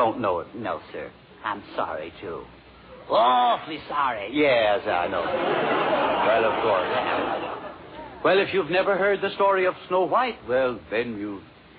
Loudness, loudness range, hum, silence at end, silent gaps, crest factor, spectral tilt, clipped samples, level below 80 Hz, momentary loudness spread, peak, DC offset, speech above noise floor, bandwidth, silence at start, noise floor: -24 LUFS; 4 LU; none; 0.3 s; none; 16 dB; -2 dB/octave; under 0.1%; -58 dBFS; 15 LU; -8 dBFS; under 0.1%; 23 dB; 5 kHz; 0 s; -46 dBFS